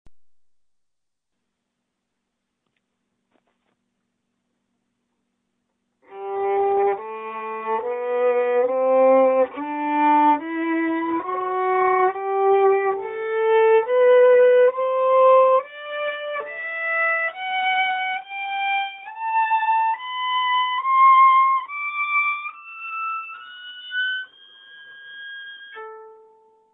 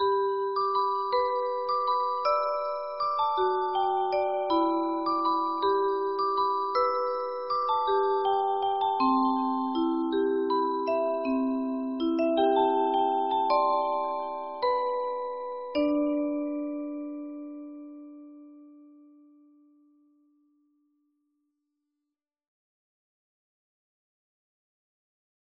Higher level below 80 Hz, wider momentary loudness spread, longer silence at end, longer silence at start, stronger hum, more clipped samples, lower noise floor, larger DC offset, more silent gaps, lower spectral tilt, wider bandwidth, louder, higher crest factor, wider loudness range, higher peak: about the same, -72 dBFS vs -68 dBFS; first, 17 LU vs 9 LU; second, 0.6 s vs 6.55 s; about the same, 0.05 s vs 0 s; neither; neither; second, -81 dBFS vs -87 dBFS; neither; neither; first, -6.5 dB/octave vs -2 dB/octave; second, 3.9 kHz vs 5.8 kHz; first, -20 LUFS vs -27 LUFS; about the same, 14 dB vs 16 dB; first, 11 LU vs 6 LU; first, -6 dBFS vs -12 dBFS